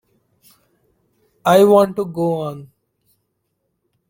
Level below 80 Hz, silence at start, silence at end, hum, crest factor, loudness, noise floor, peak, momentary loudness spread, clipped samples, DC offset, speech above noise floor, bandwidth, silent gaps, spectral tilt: -60 dBFS; 1.45 s; 1.45 s; none; 18 dB; -16 LUFS; -72 dBFS; -2 dBFS; 16 LU; under 0.1%; under 0.1%; 57 dB; 17 kHz; none; -6.5 dB/octave